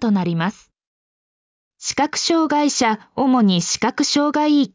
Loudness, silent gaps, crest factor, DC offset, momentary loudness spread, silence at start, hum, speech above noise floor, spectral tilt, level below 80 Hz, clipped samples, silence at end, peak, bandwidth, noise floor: -18 LUFS; 0.87-1.71 s; 14 dB; under 0.1%; 7 LU; 0 s; none; over 72 dB; -4 dB/octave; -58 dBFS; under 0.1%; 0.05 s; -6 dBFS; 7.8 kHz; under -90 dBFS